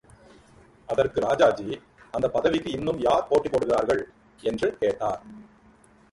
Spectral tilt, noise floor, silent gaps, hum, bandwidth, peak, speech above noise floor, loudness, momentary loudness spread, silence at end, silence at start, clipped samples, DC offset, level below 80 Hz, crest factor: -5.5 dB/octave; -56 dBFS; none; none; 11.5 kHz; -6 dBFS; 32 dB; -25 LUFS; 12 LU; 0.7 s; 0.9 s; under 0.1%; under 0.1%; -54 dBFS; 20 dB